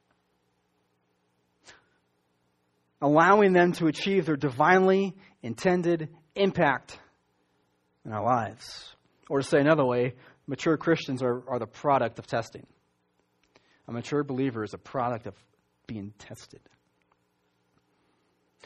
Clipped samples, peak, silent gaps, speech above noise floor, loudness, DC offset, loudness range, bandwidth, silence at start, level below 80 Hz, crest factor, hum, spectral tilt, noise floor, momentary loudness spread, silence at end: under 0.1%; -6 dBFS; none; 47 dB; -26 LUFS; under 0.1%; 11 LU; 12 kHz; 1.7 s; -66 dBFS; 24 dB; none; -6.5 dB/octave; -73 dBFS; 21 LU; 2.2 s